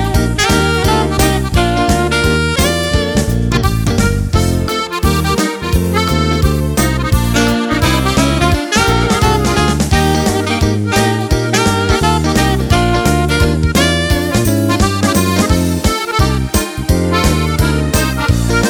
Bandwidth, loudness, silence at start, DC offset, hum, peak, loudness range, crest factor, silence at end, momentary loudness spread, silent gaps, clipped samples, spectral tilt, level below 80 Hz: 19.5 kHz; -13 LUFS; 0 s; under 0.1%; none; 0 dBFS; 2 LU; 12 dB; 0 s; 3 LU; none; under 0.1%; -5 dB/octave; -20 dBFS